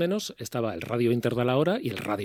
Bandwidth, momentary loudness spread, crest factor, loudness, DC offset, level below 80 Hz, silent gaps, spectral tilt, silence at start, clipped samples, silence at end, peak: 17.5 kHz; 7 LU; 16 dB; -27 LUFS; under 0.1%; -64 dBFS; none; -6 dB/octave; 0 s; under 0.1%; 0 s; -10 dBFS